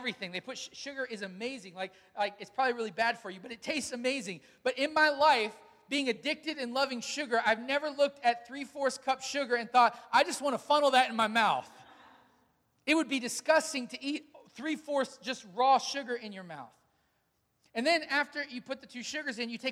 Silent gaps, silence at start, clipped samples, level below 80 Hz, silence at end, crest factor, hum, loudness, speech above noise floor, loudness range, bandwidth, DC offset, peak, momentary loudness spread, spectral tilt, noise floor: none; 0 s; under 0.1%; -78 dBFS; 0 s; 20 dB; none; -31 LUFS; 45 dB; 6 LU; 16 kHz; under 0.1%; -12 dBFS; 14 LU; -2.5 dB/octave; -76 dBFS